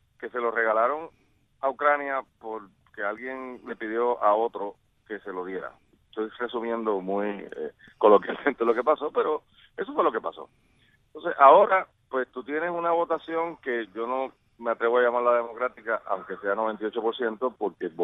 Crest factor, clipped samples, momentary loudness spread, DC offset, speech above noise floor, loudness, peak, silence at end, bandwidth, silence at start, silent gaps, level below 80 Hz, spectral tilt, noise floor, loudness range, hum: 24 dB; under 0.1%; 15 LU; under 0.1%; 30 dB; -26 LUFS; -2 dBFS; 0 s; 4 kHz; 0.2 s; none; -70 dBFS; -7.5 dB/octave; -56 dBFS; 6 LU; none